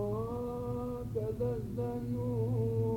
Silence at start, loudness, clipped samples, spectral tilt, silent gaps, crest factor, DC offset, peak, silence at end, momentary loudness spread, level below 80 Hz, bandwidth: 0 s; -36 LUFS; under 0.1%; -10 dB/octave; none; 12 dB; under 0.1%; -22 dBFS; 0 s; 5 LU; -52 dBFS; 16.5 kHz